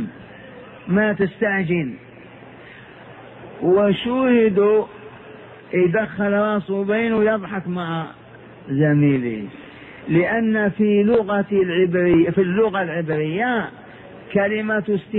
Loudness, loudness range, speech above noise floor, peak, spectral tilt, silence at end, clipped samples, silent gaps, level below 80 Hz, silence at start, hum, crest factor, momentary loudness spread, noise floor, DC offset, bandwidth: -19 LUFS; 4 LU; 23 dB; -4 dBFS; -10.5 dB/octave; 0 s; under 0.1%; none; -54 dBFS; 0 s; none; 16 dB; 23 LU; -42 dBFS; under 0.1%; 4.1 kHz